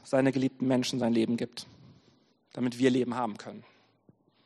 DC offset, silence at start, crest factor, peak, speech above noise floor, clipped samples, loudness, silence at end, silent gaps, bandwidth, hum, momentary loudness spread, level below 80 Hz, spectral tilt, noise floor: under 0.1%; 0.05 s; 20 dB; -12 dBFS; 37 dB; under 0.1%; -29 LUFS; 0.85 s; none; 12 kHz; none; 19 LU; -72 dBFS; -6 dB/octave; -66 dBFS